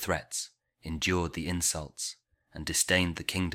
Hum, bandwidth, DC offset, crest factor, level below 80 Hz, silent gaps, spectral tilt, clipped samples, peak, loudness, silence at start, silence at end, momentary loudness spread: none; 16.5 kHz; under 0.1%; 22 dB; -50 dBFS; none; -3 dB/octave; under 0.1%; -10 dBFS; -30 LUFS; 0 s; 0 s; 15 LU